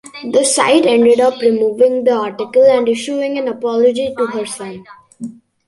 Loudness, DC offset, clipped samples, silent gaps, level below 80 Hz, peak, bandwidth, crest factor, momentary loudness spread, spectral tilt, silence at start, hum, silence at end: -14 LUFS; under 0.1%; under 0.1%; none; -60 dBFS; -2 dBFS; 11.5 kHz; 12 dB; 16 LU; -3 dB/octave; 0.05 s; none; 0.35 s